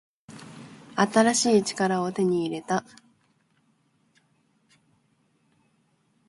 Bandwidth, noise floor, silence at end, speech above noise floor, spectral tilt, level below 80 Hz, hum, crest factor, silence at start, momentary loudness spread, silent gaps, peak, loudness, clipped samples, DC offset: 11.5 kHz; -68 dBFS; 3.5 s; 45 dB; -4 dB/octave; -70 dBFS; none; 22 dB; 0.3 s; 24 LU; none; -6 dBFS; -24 LUFS; under 0.1%; under 0.1%